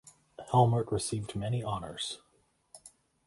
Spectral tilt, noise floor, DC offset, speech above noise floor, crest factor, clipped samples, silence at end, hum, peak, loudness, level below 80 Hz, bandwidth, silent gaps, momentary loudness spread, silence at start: -5.5 dB/octave; -71 dBFS; under 0.1%; 41 dB; 22 dB; under 0.1%; 0.4 s; none; -10 dBFS; -31 LUFS; -58 dBFS; 11.5 kHz; none; 26 LU; 0.05 s